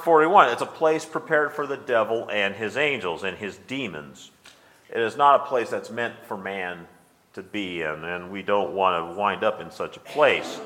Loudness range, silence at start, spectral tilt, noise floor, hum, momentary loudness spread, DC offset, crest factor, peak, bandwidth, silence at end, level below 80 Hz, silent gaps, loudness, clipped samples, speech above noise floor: 5 LU; 0 s; -4.5 dB/octave; -53 dBFS; none; 15 LU; under 0.1%; 22 dB; -2 dBFS; 16 kHz; 0 s; -68 dBFS; none; -24 LUFS; under 0.1%; 29 dB